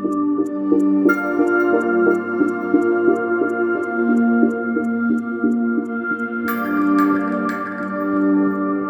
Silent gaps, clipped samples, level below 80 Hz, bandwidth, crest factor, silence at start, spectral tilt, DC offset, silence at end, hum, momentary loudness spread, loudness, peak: none; under 0.1%; -64 dBFS; 19 kHz; 16 dB; 0 s; -8 dB/octave; under 0.1%; 0 s; none; 6 LU; -19 LUFS; -2 dBFS